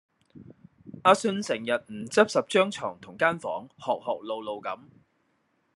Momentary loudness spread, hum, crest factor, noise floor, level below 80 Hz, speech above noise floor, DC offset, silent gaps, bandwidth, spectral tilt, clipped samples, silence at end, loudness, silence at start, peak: 13 LU; none; 24 dB; -72 dBFS; -74 dBFS; 45 dB; under 0.1%; none; 12 kHz; -4 dB/octave; under 0.1%; 1 s; -27 LUFS; 0.35 s; -4 dBFS